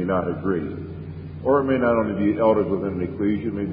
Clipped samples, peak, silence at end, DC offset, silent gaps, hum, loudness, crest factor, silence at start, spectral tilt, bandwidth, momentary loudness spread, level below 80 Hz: under 0.1%; -6 dBFS; 0 s; under 0.1%; none; none; -22 LUFS; 16 dB; 0 s; -12.5 dB/octave; 5 kHz; 14 LU; -44 dBFS